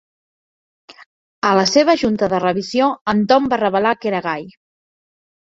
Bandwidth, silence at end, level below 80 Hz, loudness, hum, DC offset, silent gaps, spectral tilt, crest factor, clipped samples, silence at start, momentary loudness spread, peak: 7.8 kHz; 1 s; -54 dBFS; -17 LUFS; none; under 0.1%; 1.06-1.42 s, 3.01-3.06 s; -4.5 dB/octave; 18 dB; under 0.1%; 0.9 s; 8 LU; 0 dBFS